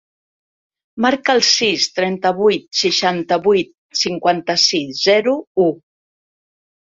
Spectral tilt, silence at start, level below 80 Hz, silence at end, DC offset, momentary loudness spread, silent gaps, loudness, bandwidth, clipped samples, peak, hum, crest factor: -3 dB/octave; 0.95 s; -60 dBFS; 1.1 s; under 0.1%; 6 LU; 3.78-3.89 s, 5.47-5.55 s; -16 LUFS; 7.8 kHz; under 0.1%; -2 dBFS; none; 16 dB